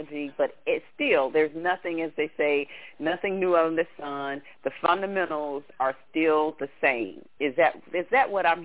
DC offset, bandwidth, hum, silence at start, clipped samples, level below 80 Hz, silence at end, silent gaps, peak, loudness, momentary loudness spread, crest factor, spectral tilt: 0.2%; 4 kHz; none; 0 s; under 0.1%; -68 dBFS; 0 s; none; -8 dBFS; -26 LUFS; 10 LU; 18 dB; -8 dB/octave